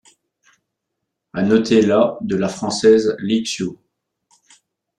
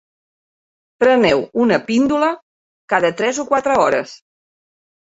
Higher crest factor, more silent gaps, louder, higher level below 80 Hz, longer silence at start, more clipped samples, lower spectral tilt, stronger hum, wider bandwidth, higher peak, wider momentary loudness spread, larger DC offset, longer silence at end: about the same, 18 dB vs 18 dB; second, none vs 2.42-2.88 s; about the same, -17 LUFS vs -16 LUFS; about the same, -56 dBFS vs -56 dBFS; first, 1.35 s vs 1 s; neither; about the same, -5.5 dB/octave vs -4.5 dB/octave; neither; first, 10.5 kHz vs 8 kHz; about the same, -2 dBFS vs 0 dBFS; first, 11 LU vs 6 LU; neither; first, 1.25 s vs 0.9 s